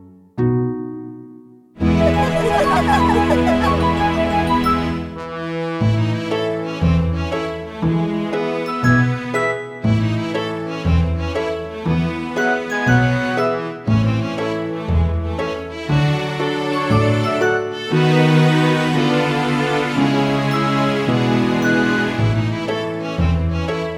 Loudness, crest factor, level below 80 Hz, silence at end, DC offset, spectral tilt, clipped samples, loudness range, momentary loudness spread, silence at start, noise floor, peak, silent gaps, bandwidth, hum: -18 LUFS; 16 dB; -32 dBFS; 0 s; under 0.1%; -7 dB/octave; under 0.1%; 4 LU; 8 LU; 0 s; -42 dBFS; -2 dBFS; none; 14 kHz; none